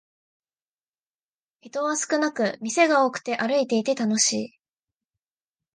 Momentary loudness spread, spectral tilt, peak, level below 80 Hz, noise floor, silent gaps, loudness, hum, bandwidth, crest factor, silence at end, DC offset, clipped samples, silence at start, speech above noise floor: 9 LU; -2.5 dB/octave; -6 dBFS; -78 dBFS; under -90 dBFS; none; -23 LUFS; none; 10 kHz; 20 dB; 1.3 s; under 0.1%; under 0.1%; 1.65 s; over 67 dB